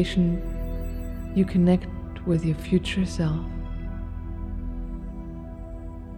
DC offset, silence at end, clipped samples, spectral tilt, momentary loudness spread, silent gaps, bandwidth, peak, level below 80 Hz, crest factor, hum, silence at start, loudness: under 0.1%; 0 s; under 0.1%; -7.5 dB/octave; 16 LU; none; 19 kHz; -10 dBFS; -34 dBFS; 16 dB; 60 Hz at -50 dBFS; 0 s; -27 LUFS